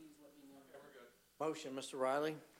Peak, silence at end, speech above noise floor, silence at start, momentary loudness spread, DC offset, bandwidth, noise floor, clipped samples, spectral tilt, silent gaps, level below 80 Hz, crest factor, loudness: -26 dBFS; 0.15 s; 22 dB; 0 s; 24 LU; under 0.1%; 16 kHz; -63 dBFS; under 0.1%; -4 dB/octave; none; -88 dBFS; 18 dB; -41 LUFS